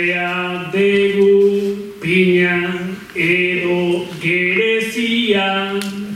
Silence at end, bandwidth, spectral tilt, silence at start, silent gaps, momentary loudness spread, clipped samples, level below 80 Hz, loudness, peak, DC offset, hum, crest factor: 0 s; 15 kHz; -5.5 dB/octave; 0 s; none; 9 LU; under 0.1%; -56 dBFS; -16 LUFS; -2 dBFS; under 0.1%; none; 14 dB